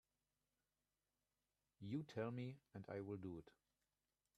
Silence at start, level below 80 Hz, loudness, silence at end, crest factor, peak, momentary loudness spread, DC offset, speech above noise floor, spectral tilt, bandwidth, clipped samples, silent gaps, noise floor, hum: 1.8 s; -84 dBFS; -52 LUFS; 0.9 s; 20 dB; -34 dBFS; 11 LU; under 0.1%; over 40 dB; -8 dB/octave; 12.5 kHz; under 0.1%; none; under -90 dBFS; 50 Hz at -70 dBFS